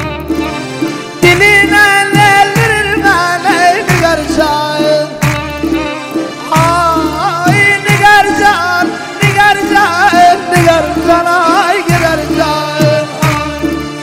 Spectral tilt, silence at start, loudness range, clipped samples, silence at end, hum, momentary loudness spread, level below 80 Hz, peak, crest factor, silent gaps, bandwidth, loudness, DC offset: -4.5 dB/octave; 0 s; 4 LU; 1%; 0 s; none; 10 LU; -32 dBFS; 0 dBFS; 10 dB; none; 16.5 kHz; -9 LUFS; under 0.1%